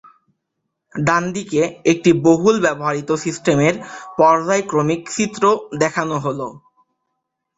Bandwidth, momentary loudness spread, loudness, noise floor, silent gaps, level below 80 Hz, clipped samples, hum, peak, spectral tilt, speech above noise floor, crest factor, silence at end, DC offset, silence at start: 8 kHz; 9 LU; -17 LUFS; -76 dBFS; none; -56 dBFS; under 0.1%; none; 0 dBFS; -5.5 dB/octave; 59 dB; 18 dB; 1 s; under 0.1%; 0.95 s